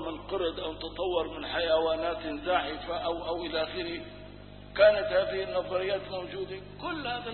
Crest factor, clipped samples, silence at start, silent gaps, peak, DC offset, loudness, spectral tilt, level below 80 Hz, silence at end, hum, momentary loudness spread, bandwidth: 20 dB; under 0.1%; 0 s; none; -10 dBFS; under 0.1%; -30 LUFS; -8.5 dB/octave; -52 dBFS; 0 s; 50 Hz at -50 dBFS; 14 LU; 4.4 kHz